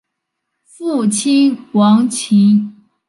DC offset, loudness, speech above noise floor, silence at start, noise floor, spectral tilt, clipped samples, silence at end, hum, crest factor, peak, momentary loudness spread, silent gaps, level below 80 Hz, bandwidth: under 0.1%; -13 LUFS; 63 dB; 0.8 s; -75 dBFS; -5.5 dB/octave; under 0.1%; 0.35 s; none; 12 dB; -2 dBFS; 9 LU; none; -66 dBFS; 11.5 kHz